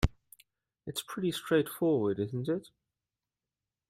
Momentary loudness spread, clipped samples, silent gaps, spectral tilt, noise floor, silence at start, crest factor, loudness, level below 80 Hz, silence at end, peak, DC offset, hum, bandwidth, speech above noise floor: 10 LU; under 0.1%; none; -6 dB/octave; under -90 dBFS; 0 s; 22 dB; -32 LUFS; -46 dBFS; 1.25 s; -12 dBFS; under 0.1%; none; 16 kHz; over 59 dB